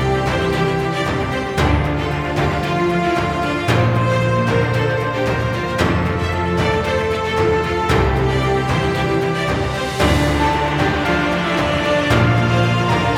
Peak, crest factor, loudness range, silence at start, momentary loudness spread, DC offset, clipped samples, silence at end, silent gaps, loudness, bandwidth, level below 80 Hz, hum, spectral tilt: 0 dBFS; 16 dB; 2 LU; 0 s; 4 LU; under 0.1%; under 0.1%; 0 s; none; -17 LUFS; 15.5 kHz; -30 dBFS; none; -6 dB/octave